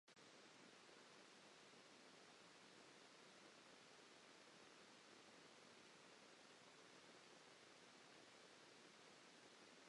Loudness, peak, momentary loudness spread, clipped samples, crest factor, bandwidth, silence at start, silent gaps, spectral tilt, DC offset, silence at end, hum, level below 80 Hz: -66 LUFS; -52 dBFS; 0 LU; under 0.1%; 16 dB; 11 kHz; 0.05 s; none; -2 dB/octave; under 0.1%; 0 s; none; under -90 dBFS